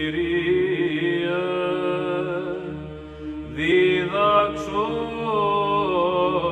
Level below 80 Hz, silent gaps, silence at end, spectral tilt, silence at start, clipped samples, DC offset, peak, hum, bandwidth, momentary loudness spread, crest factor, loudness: -48 dBFS; none; 0 s; -6.5 dB/octave; 0 s; under 0.1%; under 0.1%; -8 dBFS; none; 8.6 kHz; 13 LU; 16 dB; -22 LUFS